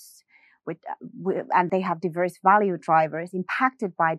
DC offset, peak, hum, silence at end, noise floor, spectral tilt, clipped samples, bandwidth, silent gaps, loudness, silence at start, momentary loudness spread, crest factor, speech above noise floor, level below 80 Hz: under 0.1%; -6 dBFS; none; 0 s; -59 dBFS; -7 dB/octave; under 0.1%; 13 kHz; none; -24 LUFS; 0 s; 17 LU; 20 dB; 35 dB; -78 dBFS